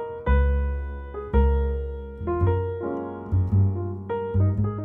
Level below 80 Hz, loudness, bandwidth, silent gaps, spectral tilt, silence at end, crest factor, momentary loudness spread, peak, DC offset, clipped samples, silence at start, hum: -28 dBFS; -25 LUFS; 3.7 kHz; none; -11.5 dB/octave; 0 s; 16 dB; 10 LU; -8 dBFS; under 0.1%; under 0.1%; 0 s; none